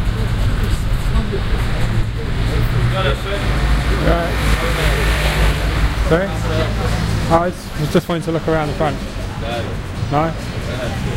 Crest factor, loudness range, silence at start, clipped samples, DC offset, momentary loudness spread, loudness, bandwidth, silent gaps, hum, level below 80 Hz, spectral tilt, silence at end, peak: 16 dB; 2 LU; 0 s; under 0.1%; under 0.1%; 6 LU; -19 LUFS; 16 kHz; none; none; -20 dBFS; -6 dB/octave; 0 s; 0 dBFS